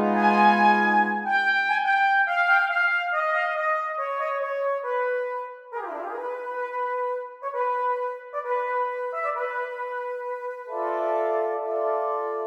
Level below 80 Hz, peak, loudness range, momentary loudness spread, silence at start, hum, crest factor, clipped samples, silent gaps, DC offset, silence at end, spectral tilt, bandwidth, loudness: -82 dBFS; -8 dBFS; 8 LU; 12 LU; 0 s; none; 18 dB; under 0.1%; none; under 0.1%; 0 s; -5.5 dB/octave; 9 kHz; -24 LUFS